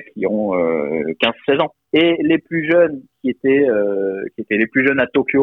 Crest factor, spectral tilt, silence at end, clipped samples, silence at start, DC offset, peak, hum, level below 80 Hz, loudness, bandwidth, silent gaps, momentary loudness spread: 14 dB; -8 dB/octave; 0 s; under 0.1%; 0 s; under 0.1%; -2 dBFS; none; -58 dBFS; -17 LUFS; 4.2 kHz; none; 7 LU